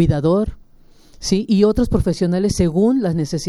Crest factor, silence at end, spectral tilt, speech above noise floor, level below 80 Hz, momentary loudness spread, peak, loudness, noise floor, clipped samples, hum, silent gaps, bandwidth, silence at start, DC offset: 14 dB; 0 s; -7 dB/octave; 30 dB; -32 dBFS; 5 LU; -2 dBFS; -18 LUFS; -46 dBFS; under 0.1%; none; none; 12.5 kHz; 0 s; under 0.1%